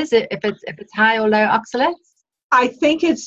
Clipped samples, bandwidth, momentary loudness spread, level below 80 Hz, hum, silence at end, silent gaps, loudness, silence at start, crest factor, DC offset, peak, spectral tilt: under 0.1%; 8 kHz; 11 LU; -58 dBFS; none; 0 s; 2.44-2.50 s; -17 LUFS; 0 s; 16 dB; under 0.1%; -2 dBFS; -4 dB/octave